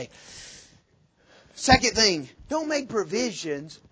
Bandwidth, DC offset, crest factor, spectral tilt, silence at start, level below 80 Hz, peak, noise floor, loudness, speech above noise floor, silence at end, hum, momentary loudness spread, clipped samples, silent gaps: 8 kHz; under 0.1%; 24 dB; -3 dB/octave; 0 s; -44 dBFS; -2 dBFS; -63 dBFS; -24 LUFS; 37 dB; 0.15 s; none; 23 LU; under 0.1%; none